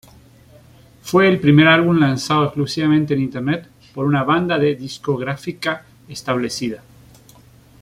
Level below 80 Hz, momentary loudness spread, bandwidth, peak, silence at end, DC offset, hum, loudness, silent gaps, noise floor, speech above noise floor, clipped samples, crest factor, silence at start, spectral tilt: -54 dBFS; 15 LU; 15.5 kHz; -2 dBFS; 1.05 s; under 0.1%; none; -17 LUFS; none; -47 dBFS; 30 dB; under 0.1%; 16 dB; 1.05 s; -6 dB/octave